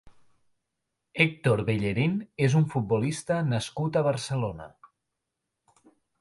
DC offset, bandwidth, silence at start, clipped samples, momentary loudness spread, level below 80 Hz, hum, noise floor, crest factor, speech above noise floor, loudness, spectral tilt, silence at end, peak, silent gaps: under 0.1%; 11.5 kHz; 0.05 s; under 0.1%; 7 LU; -58 dBFS; none; -84 dBFS; 22 dB; 58 dB; -27 LUFS; -6.5 dB/octave; 1.55 s; -8 dBFS; none